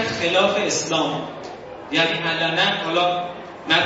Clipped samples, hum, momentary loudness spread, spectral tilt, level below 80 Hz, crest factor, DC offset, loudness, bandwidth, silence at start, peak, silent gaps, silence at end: under 0.1%; none; 15 LU; -3 dB/octave; -60 dBFS; 18 dB; under 0.1%; -20 LUFS; 8 kHz; 0 s; -2 dBFS; none; 0 s